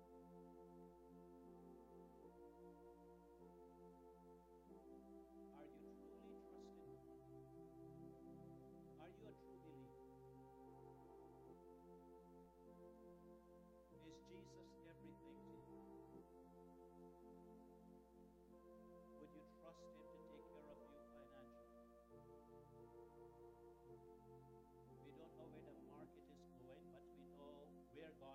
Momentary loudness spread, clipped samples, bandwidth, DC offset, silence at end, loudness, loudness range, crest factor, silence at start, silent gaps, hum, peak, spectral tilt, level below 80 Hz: 4 LU; under 0.1%; 11 kHz; under 0.1%; 0 s; -64 LUFS; 3 LU; 16 dB; 0 s; none; 60 Hz at -75 dBFS; -48 dBFS; -7 dB/octave; -78 dBFS